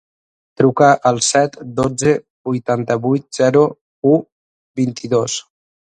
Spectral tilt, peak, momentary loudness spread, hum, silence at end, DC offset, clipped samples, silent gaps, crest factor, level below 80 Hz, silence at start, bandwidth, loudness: -5 dB/octave; 0 dBFS; 10 LU; none; 0.55 s; under 0.1%; under 0.1%; 2.30-2.44 s, 3.81-4.02 s, 4.32-4.75 s; 16 dB; -54 dBFS; 0.6 s; 11 kHz; -16 LUFS